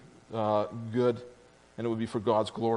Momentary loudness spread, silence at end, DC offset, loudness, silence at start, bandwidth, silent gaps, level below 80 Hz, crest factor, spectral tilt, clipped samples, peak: 11 LU; 0 s; under 0.1%; -31 LUFS; 0.05 s; 10.5 kHz; none; -70 dBFS; 18 dB; -7 dB/octave; under 0.1%; -12 dBFS